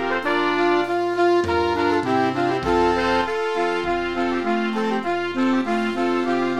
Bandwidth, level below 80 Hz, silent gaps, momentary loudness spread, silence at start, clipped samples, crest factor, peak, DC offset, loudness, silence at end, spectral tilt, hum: 11 kHz; -46 dBFS; none; 4 LU; 0 s; under 0.1%; 14 dB; -8 dBFS; 0.8%; -21 LUFS; 0 s; -5.5 dB/octave; none